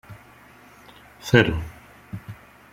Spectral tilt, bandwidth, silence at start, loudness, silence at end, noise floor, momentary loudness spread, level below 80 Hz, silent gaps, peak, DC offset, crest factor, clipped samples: -6 dB/octave; 16 kHz; 0.1 s; -20 LUFS; 0.4 s; -50 dBFS; 27 LU; -44 dBFS; none; -2 dBFS; under 0.1%; 24 dB; under 0.1%